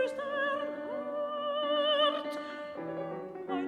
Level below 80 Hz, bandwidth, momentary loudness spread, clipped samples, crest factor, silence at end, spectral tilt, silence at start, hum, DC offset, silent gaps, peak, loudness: -80 dBFS; 11 kHz; 12 LU; under 0.1%; 16 dB; 0 s; -4.5 dB/octave; 0 s; none; under 0.1%; none; -18 dBFS; -33 LUFS